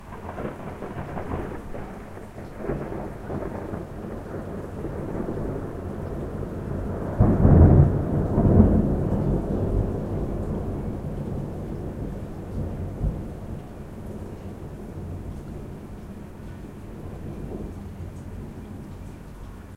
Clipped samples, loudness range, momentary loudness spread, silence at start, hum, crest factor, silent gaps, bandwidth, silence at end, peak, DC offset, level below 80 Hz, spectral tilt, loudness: under 0.1%; 18 LU; 20 LU; 0 s; none; 24 dB; none; 10.5 kHz; 0 s; -2 dBFS; under 0.1%; -32 dBFS; -10 dB/octave; -26 LUFS